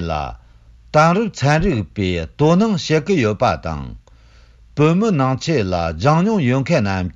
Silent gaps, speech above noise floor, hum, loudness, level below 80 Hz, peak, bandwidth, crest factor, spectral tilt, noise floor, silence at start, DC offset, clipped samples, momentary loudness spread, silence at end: none; 30 dB; none; -17 LUFS; -38 dBFS; -2 dBFS; 7.6 kHz; 14 dB; -6.5 dB/octave; -47 dBFS; 0 s; under 0.1%; under 0.1%; 10 LU; 0.05 s